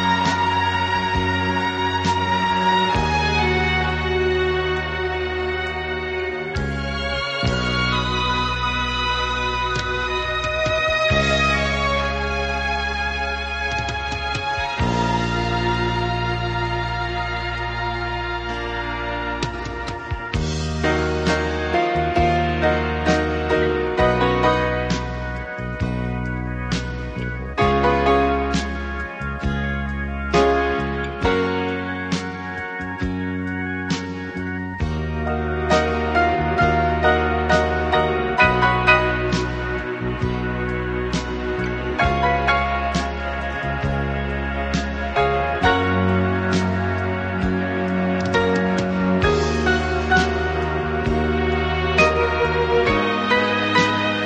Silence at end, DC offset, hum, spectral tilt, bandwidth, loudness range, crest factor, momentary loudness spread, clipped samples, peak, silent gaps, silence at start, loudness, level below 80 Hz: 0 s; under 0.1%; none; -5.5 dB/octave; 9.4 kHz; 5 LU; 18 dB; 8 LU; under 0.1%; -2 dBFS; none; 0 s; -21 LUFS; -32 dBFS